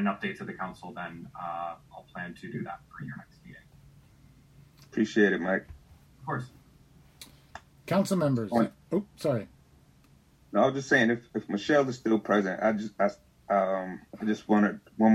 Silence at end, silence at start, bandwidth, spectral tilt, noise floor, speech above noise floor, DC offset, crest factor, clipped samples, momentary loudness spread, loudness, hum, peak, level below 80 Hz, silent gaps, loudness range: 0 s; 0 s; 16 kHz; -6.5 dB/octave; -60 dBFS; 32 dB; under 0.1%; 20 dB; under 0.1%; 19 LU; -29 LUFS; none; -8 dBFS; -62 dBFS; none; 13 LU